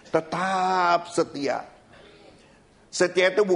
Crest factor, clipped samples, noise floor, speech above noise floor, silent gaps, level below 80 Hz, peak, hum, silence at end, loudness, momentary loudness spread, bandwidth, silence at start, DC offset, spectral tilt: 18 dB; under 0.1%; -55 dBFS; 32 dB; none; -66 dBFS; -6 dBFS; none; 0 s; -24 LUFS; 8 LU; 10.5 kHz; 0.05 s; under 0.1%; -4 dB/octave